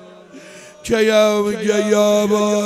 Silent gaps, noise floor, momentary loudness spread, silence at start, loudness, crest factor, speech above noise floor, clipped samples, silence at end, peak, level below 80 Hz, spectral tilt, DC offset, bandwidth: none; -40 dBFS; 6 LU; 0.35 s; -16 LUFS; 16 dB; 25 dB; under 0.1%; 0 s; 0 dBFS; -52 dBFS; -4.5 dB/octave; under 0.1%; 15.5 kHz